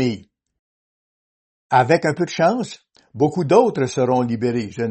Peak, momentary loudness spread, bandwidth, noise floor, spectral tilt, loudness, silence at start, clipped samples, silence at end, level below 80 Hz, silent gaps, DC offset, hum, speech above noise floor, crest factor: 0 dBFS; 8 LU; 8.6 kHz; under -90 dBFS; -6.5 dB/octave; -19 LUFS; 0 s; under 0.1%; 0 s; -62 dBFS; 0.59-1.70 s; under 0.1%; none; over 72 dB; 20 dB